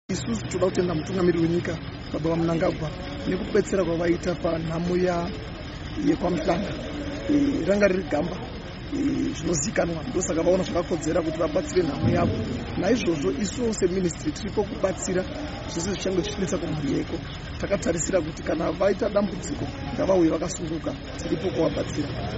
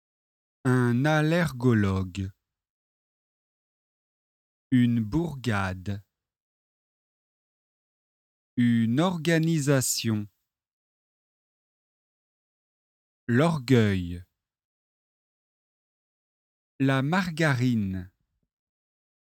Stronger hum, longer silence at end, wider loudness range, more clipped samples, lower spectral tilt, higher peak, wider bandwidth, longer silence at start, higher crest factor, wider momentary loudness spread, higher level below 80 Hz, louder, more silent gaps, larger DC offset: neither; second, 0 s vs 1.25 s; second, 2 LU vs 7 LU; neither; about the same, -6 dB/octave vs -6 dB/octave; about the same, -6 dBFS vs -8 dBFS; second, 8 kHz vs 17 kHz; second, 0.1 s vs 0.65 s; about the same, 20 dB vs 22 dB; second, 9 LU vs 13 LU; first, -40 dBFS vs -58 dBFS; about the same, -26 LUFS vs -25 LUFS; second, none vs 2.70-4.71 s, 6.40-8.57 s, 10.73-13.27 s, 14.65-16.79 s; neither